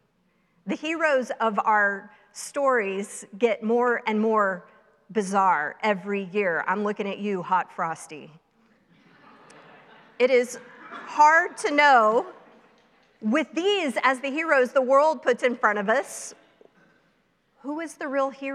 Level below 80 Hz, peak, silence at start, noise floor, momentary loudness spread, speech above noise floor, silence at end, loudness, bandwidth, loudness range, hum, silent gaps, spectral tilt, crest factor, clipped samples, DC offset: -80 dBFS; -4 dBFS; 0.65 s; -68 dBFS; 17 LU; 44 dB; 0 s; -23 LUFS; 13.5 kHz; 7 LU; none; none; -4 dB/octave; 20 dB; under 0.1%; under 0.1%